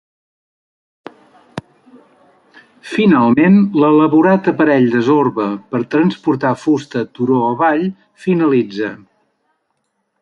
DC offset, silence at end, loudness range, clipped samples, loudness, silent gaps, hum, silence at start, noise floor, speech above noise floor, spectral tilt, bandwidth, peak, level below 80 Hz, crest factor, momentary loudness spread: under 0.1%; 1.25 s; 6 LU; under 0.1%; -14 LUFS; none; none; 1.55 s; -68 dBFS; 55 dB; -8 dB/octave; 9.4 kHz; -2 dBFS; -60 dBFS; 14 dB; 13 LU